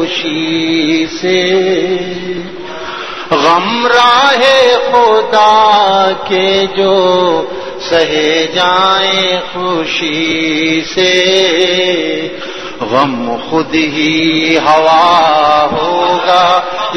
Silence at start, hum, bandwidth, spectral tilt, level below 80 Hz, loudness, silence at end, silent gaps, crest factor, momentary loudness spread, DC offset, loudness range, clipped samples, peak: 0 s; none; 11 kHz; -3.5 dB/octave; -48 dBFS; -10 LUFS; 0 s; none; 10 dB; 11 LU; 2%; 4 LU; 0.3%; 0 dBFS